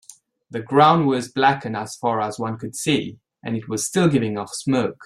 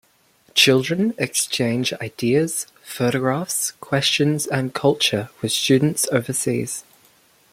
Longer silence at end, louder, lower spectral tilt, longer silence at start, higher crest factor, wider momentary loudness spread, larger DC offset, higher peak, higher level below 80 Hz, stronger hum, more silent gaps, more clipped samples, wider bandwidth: second, 0 s vs 0.7 s; about the same, -21 LUFS vs -20 LUFS; first, -5 dB/octave vs -3.5 dB/octave; about the same, 0.5 s vs 0.55 s; about the same, 18 dB vs 20 dB; first, 14 LU vs 9 LU; neither; about the same, -2 dBFS vs -2 dBFS; about the same, -60 dBFS vs -62 dBFS; neither; neither; neither; second, 14 kHz vs 16.5 kHz